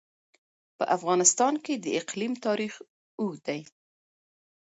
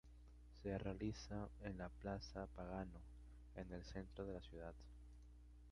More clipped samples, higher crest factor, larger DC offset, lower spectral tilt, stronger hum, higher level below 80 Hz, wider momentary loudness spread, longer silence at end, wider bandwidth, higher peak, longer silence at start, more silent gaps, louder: neither; about the same, 22 dB vs 20 dB; neither; second, -3 dB/octave vs -6.5 dB/octave; second, none vs 60 Hz at -60 dBFS; second, -80 dBFS vs -60 dBFS; about the same, 15 LU vs 17 LU; first, 1.05 s vs 0 s; second, 8.2 kHz vs 11 kHz; first, -6 dBFS vs -32 dBFS; first, 0.8 s vs 0.05 s; first, 2.89-3.18 s vs none; first, -27 LUFS vs -52 LUFS